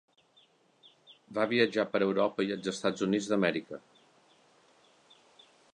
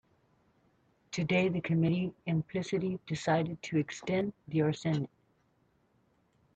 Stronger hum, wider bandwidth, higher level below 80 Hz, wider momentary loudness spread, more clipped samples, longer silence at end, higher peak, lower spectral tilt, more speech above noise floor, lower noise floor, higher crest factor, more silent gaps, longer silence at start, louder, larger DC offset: neither; first, 11 kHz vs 8.4 kHz; second, -76 dBFS vs -66 dBFS; first, 12 LU vs 6 LU; neither; first, 2 s vs 1.5 s; first, -10 dBFS vs -16 dBFS; second, -5 dB/octave vs -6.5 dB/octave; second, 36 dB vs 40 dB; second, -66 dBFS vs -71 dBFS; about the same, 22 dB vs 18 dB; neither; about the same, 1.1 s vs 1.1 s; about the same, -30 LUFS vs -32 LUFS; neither